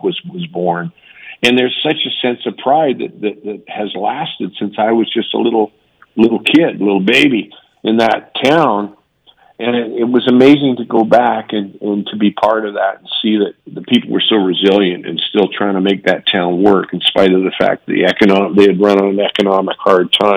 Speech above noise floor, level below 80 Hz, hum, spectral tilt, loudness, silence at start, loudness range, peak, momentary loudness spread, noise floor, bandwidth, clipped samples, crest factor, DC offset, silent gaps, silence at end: 37 dB; -58 dBFS; none; -6 dB/octave; -13 LUFS; 0.05 s; 5 LU; 0 dBFS; 11 LU; -50 dBFS; 11.5 kHz; 0.6%; 14 dB; under 0.1%; none; 0 s